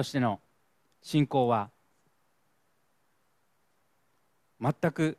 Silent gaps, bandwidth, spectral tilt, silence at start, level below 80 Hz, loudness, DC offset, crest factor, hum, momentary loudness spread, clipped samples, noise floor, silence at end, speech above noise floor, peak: none; 14 kHz; -7 dB/octave; 0 s; -70 dBFS; -29 LUFS; under 0.1%; 20 dB; none; 10 LU; under 0.1%; -74 dBFS; 0.05 s; 46 dB; -12 dBFS